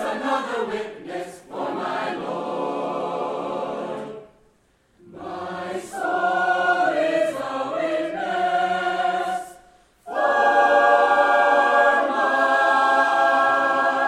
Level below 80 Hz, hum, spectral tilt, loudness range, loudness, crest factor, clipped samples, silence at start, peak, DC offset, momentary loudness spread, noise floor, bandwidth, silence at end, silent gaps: -66 dBFS; none; -4 dB/octave; 12 LU; -21 LUFS; 16 dB; under 0.1%; 0 s; -6 dBFS; under 0.1%; 15 LU; -61 dBFS; 13 kHz; 0 s; none